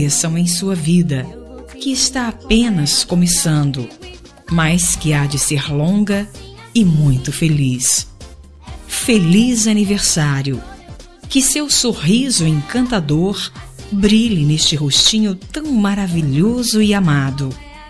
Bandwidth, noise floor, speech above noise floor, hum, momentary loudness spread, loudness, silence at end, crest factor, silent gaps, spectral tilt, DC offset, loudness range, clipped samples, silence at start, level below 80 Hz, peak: 13 kHz; -37 dBFS; 22 dB; none; 12 LU; -15 LUFS; 0 s; 16 dB; none; -4 dB/octave; 0.8%; 2 LU; under 0.1%; 0 s; -36 dBFS; 0 dBFS